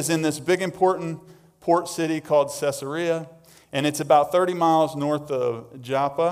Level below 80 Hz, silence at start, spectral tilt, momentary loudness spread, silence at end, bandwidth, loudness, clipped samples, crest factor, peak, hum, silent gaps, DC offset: -66 dBFS; 0 s; -5 dB/octave; 10 LU; 0 s; 16 kHz; -23 LUFS; under 0.1%; 18 dB; -6 dBFS; none; none; under 0.1%